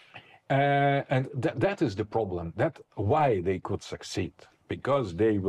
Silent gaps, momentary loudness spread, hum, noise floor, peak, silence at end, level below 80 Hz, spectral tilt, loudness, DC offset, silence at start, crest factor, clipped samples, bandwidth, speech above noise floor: none; 10 LU; none; -52 dBFS; -16 dBFS; 0 s; -58 dBFS; -7 dB/octave; -28 LUFS; under 0.1%; 0.15 s; 12 dB; under 0.1%; 11 kHz; 24 dB